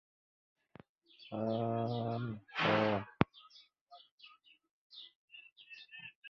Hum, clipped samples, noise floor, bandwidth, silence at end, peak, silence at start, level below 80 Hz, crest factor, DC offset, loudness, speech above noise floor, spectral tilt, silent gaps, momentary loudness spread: none; under 0.1%; -63 dBFS; 7.2 kHz; 0 s; -8 dBFS; 1.2 s; -66 dBFS; 32 dB; under 0.1%; -36 LUFS; 29 dB; -4.5 dB/octave; 3.81-3.87 s, 4.11-4.18 s, 4.71-4.90 s, 5.15-5.28 s, 5.52-5.56 s, 6.15-6.22 s; 25 LU